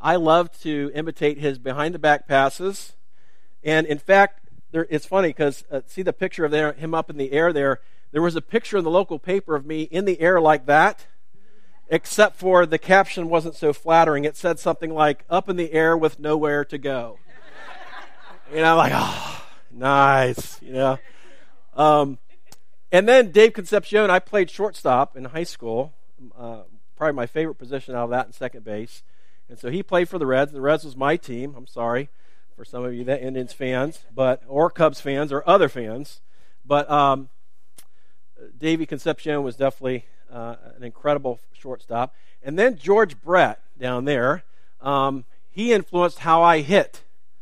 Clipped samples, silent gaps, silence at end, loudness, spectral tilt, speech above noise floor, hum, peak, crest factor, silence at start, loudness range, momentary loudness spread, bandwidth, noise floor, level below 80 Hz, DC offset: under 0.1%; none; 0.55 s; -21 LUFS; -5.5 dB/octave; 48 dB; none; 0 dBFS; 20 dB; 0 s; 8 LU; 17 LU; 15.5 kHz; -69 dBFS; -64 dBFS; 2%